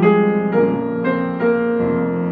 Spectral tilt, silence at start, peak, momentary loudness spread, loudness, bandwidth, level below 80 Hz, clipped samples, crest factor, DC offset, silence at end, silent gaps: -11 dB/octave; 0 s; -2 dBFS; 4 LU; -18 LUFS; 4.6 kHz; -52 dBFS; under 0.1%; 14 dB; under 0.1%; 0 s; none